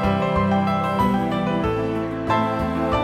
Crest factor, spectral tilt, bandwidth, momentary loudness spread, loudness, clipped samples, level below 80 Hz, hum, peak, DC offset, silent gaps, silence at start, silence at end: 14 dB; -7.5 dB/octave; 14.5 kHz; 3 LU; -21 LUFS; under 0.1%; -38 dBFS; none; -6 dBFS; under 0.1%; none; 0 s; 0 s